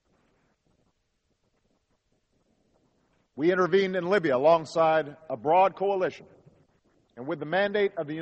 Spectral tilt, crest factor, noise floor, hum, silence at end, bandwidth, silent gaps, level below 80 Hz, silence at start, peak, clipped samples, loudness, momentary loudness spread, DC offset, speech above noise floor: -6.5 dB/octave; 18 dB; -75 dBFS; none; 0 s; 8.4 kHz; none; -72 dBFS; 3.35 s; -10 dBFS; under 0.1%; -25 LUFS; 11 LU; under 0.1%; 50 dB